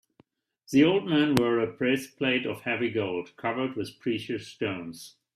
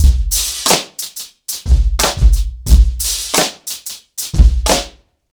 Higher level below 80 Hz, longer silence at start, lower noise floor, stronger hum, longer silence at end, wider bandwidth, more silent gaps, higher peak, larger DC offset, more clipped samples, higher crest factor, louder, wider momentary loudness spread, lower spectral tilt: second, -66 dBFS vs -14 dBFS; first, 0.7 s vs 0 s; first, -64 dBFS vs -35 dBFS; neither; second, 0.25 s vs 0.45 s; second, 15 kHz vs over 20 kHz; neither; about the same, -2 dBFS vs 0 dBFS; neither; second, under 0.1% vs 0.3%; first, 26 dB vs 14 dB; second, -27 LUFS vs -15 LUFS; about the same, 11 LU vs 12 LU; first, -5.5 dB/octave vs -3 dB/octave